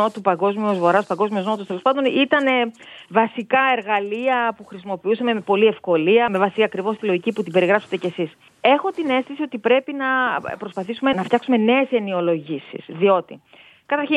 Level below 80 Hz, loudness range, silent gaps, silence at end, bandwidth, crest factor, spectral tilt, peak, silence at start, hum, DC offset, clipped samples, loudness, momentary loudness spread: -70 dBFS; 2 LU; none; 0 s; 11 kHz; 18 dB; -6.5 dB/octave; -2 dBFS; 0 s; none; under 0.1%; under 0.1%; -20 LUFS; 9 LU